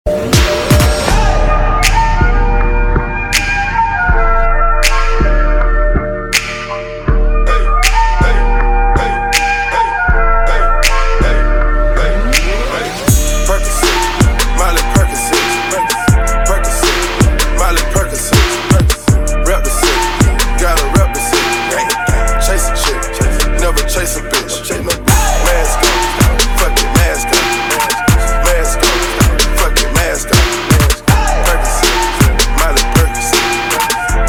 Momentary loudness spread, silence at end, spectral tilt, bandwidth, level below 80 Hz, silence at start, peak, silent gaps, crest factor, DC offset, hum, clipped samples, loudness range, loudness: 3 LU; 0 s; -3.5 dB/octave; 17.5 kHz; -14 dBFS; 0.05 s; 0 dBFS; none; 10 dB; under 0.1%; none; 0.1%; 2 LU; -12 LUFS